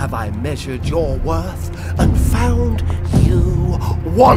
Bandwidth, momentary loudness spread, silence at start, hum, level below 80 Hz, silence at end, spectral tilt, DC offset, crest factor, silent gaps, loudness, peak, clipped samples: 15.5 kHz; 8 LU; 0 s; none; -20 dBFS; 0 s; -7.5 dB/octave; under 0.1%; 14 dB; none; -18 LUFS; 0 dBFS; under 0.1%